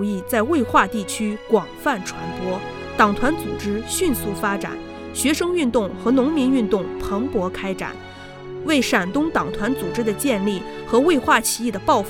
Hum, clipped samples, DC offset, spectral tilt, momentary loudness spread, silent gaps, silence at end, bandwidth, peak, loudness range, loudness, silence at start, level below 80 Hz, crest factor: none; under 0.1%; under 0.1%; -4 dB/octave; 11 LU; none; 0 s; 17.5 kHz; -2 dBFS; 3 LU; -21 LUFS; 0 s; -44 dBFS; 20 dB